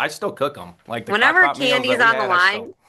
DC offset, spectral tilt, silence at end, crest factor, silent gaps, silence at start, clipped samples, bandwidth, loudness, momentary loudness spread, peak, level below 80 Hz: under 0.1%; -3 dB/octave; 0.15 s; 16 dB; none; 0 s; under 0.1%; 12.5 kHz; -17 LUFS; 12 LU; -2 dBFS; -68 dBFS